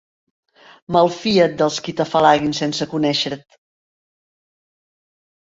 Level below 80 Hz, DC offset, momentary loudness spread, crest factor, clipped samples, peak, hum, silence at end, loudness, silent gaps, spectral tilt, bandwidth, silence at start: -58 dBFS; under 0.1%; 8 LU; 20 dB; under 0.1%; -2 dBFS; none; 2.05 s; -18 LUFS; none; -5 dB/octave; 7.8 kHz; 0.9 s